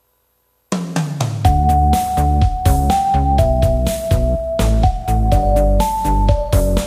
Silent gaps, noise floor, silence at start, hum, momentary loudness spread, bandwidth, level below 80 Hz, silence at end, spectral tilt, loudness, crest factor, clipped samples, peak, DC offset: none; -63 dBFS; 0.7 s; none; 6 LU; 15.5 kHz; -18 dBFS; 0 s; -6.5 dB/octave; -16 LUFS; 14 dB; under 0.1%; 0 dBFS; under 0.1%